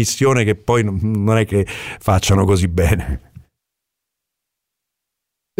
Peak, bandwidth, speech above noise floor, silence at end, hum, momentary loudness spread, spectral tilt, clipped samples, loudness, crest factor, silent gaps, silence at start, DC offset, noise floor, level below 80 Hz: -4 dBFS; 16 kHz; 64 dB; 2.4 s; none; 9 LU; -5.5 dB/octave; under 0.1%; -17 LUFS; 14 dB; none; 0 s; under 0.1%; -80 dBFS; -32 dBFS